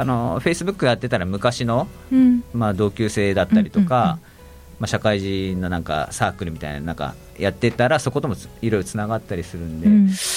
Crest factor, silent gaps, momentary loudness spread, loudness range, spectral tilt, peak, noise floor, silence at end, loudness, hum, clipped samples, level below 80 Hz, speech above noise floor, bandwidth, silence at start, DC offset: 16 dB; none; 12 LU; 4 LU; -6 dB/octave; -4 dBFS; -43 dBFS; 0 s; -21 LUFS; none; under 0.1%; -42 dBFS; 23 dB; 16 kHz; 0 s; under 0.1%